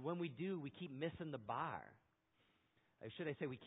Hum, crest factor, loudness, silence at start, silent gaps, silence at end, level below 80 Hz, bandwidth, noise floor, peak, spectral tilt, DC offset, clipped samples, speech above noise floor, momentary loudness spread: none; 18 dB; -47 LUFS; 0 s; none; 0 s; -78 dBFS; 3.9 kHz; -80 dBFS; -30 dBFS; -4 dB/octave; under 0.1%; under 0.1%; 33 dB; 10 LU